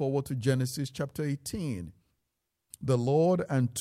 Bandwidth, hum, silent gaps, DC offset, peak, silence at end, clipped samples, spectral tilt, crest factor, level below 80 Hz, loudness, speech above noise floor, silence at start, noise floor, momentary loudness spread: 15.5 kHz; none; none; under 0.1%; -14 dBFS; 0 s; under 0.1%; -6.5 dB/octave; 16 dB; -60 dBFS; -30 LUFS; 54 dB; 0 s; -83 dBFS; 11 LU